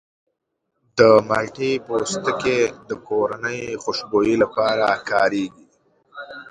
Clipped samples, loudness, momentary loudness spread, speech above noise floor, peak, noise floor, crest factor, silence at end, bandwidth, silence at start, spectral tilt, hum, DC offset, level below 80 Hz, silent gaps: under 0.1%; -20 LUFS; 14 LU; 56 dB; 0 dBFS; -76 dBFS; 20 dB; 0.1 s; 11 kHz; 0.95 s; -4.5 dB/octave; none; under 0.1%; -56 dBFS; none